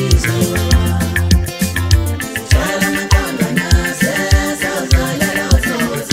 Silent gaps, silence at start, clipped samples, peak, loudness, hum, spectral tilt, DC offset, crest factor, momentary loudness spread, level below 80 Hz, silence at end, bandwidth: none; 0 s; under 0.1%; 0 dBFS; -15 LUFS; none; -4.5 dB/octave; under 0.1%; 14 dB; 4 LU; -20 dBFS; 0 s; 16.5 kHz